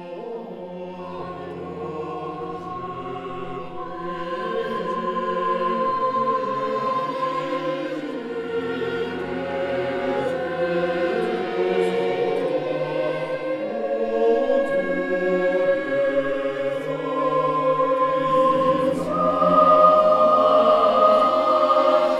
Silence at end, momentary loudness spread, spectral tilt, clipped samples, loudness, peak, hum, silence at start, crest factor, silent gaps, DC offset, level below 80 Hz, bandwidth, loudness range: 0 s; 16 LU; -6.5 dB/octave; under 0.1%; -21 LUFS; -4 dBFS; none; 0 s; 18 dB; none; under 0.1%; -60 dBFS; 10.5 kHz; 13 LU